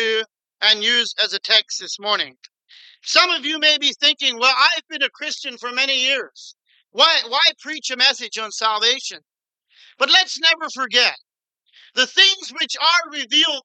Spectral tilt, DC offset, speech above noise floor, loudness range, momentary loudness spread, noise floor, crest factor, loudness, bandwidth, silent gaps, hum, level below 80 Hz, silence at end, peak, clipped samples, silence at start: 1 dB/octave; under 0.1%; 42 dB; 2 LU; 12 LU; -61 dBFS; 18 dB; -17 LUFS; 9.2 kHz; none; none; under -90 dBFS; 0.05 s; -2 dBFS; under 0.1%; 0 s